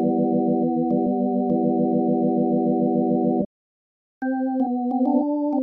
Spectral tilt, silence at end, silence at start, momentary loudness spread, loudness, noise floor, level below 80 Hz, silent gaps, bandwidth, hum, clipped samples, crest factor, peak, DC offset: -11.5 dB/octave; 0 s; 0 s; 4 LU; -22 LUFS; under -90 dBFS; -68 dBFS; 3.46-4.21 s; 1.7 kHz; none; under 0.1%; 12 dB; -8 dBFS; under 0.1%